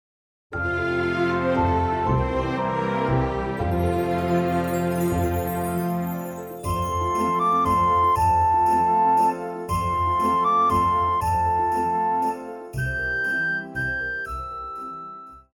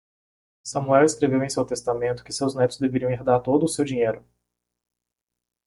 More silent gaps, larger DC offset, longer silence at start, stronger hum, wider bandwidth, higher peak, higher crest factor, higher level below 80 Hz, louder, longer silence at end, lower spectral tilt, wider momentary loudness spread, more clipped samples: neither; neither; second, 0.5 s vs 0.65 s; second, none vs 60 Hz at -40 dBFS; first, over 20 kHz vs 11.5 kHz; second, -10 dBFS vs -4 dBFS; second, 12 dB vs 20 dB; first, -40 dBFS vs -58 dBFS; about the same, -23 LUFS vs -23 LUFS; second, 0.15 s vs 1.45 s; about the same, -6.5 dB/octave vs -5.5 dB/octave; first, 12 LU vs 9 LU; neither